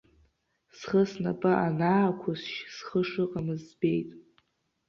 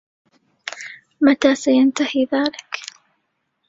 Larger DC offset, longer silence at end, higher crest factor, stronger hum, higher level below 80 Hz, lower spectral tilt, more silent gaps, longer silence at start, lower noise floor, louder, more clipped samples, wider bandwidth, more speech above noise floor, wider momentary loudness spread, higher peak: neither; second, 0.65 s vs 0.85 s; about the same, 18 dB vs 18 dB; neither; about the same, -64 dBFS vs -62 dBFS; first, -7.5 dB/octave vs -3 dB/octave; neither; about the same, 0.75 s vs 0.65 s; about the same, -71 dBFS vs -71 dBFS; second, -29 LUFS vs -18 LUFS; neither; about the same, 7.2 kHz vs 7.8 kHz; second, 43 dB vs 54 dB; second, 11 LU vs 19 LU; second, -12 dBFS vs -2 dBFS